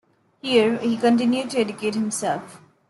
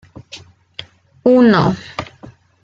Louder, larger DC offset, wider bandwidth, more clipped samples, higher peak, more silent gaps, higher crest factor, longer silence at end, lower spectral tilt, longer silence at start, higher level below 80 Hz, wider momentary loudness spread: second, -22 LUFS vs -13 LUFS; neither; first, 12 kHz vs 7.4 kHz; neither; second, -6 dBFS vs -2 dBFS; neither; about the same, 16 dB vs 16 dB; second, 0.3 s vs 0.6 s; second, -4 dB/octave vs -7.5 dB/octave; about the same, 0.45 s vs 0.35 s; second, -70 dBFS vs -52 dBFS; second, 8 LU vs 25 LU